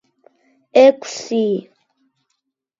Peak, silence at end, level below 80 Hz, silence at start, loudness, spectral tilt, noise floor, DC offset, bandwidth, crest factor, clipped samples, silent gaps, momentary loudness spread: 0 dBFS; 1.2 s; -70 dBFS; 0.75 s; -16 LUFS; -4.5 dB/octave; -74 dBFS; under 0.1%; 7.8 kHz; 18 dB; under 0.1%; none; 13 LU